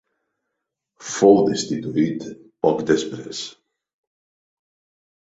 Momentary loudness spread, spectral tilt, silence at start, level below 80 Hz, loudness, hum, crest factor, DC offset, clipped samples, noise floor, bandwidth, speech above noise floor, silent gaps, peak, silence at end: 18 LU; -5 dB/octave; 1 s; -62 dBFS; -20 LUFS; none; 20 dB; under 0.1%; under 0.1%; -81 dBFS; 8 kHz; 61 dB; none; -2 dBFS; 1.8 s